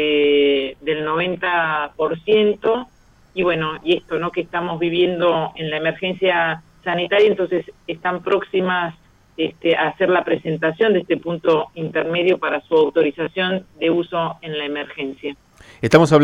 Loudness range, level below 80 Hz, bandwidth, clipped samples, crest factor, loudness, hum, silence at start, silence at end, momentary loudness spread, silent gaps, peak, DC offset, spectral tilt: 2 LU; -54 dBFS; 10.5 kHz; under 0.1%; 20 dB; -19 LUFS; none; 0 s; 0 s; 10 LU; none; 0 dBFS; under 0.1%; -6 dB/octave